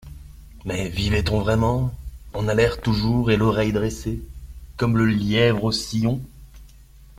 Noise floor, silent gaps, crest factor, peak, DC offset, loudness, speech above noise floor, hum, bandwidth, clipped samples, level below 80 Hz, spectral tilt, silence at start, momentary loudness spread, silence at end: -47 dBFS; none; 18 dB; -4 dBFS; under 0.1%; -22 LUFS; 26 dB; 50 Hz at -40 dBFS; 16 kHz; under 0.1%; -36 dBFS; -6 dB/octave; 0.05 s; 17 LU; 0.15 s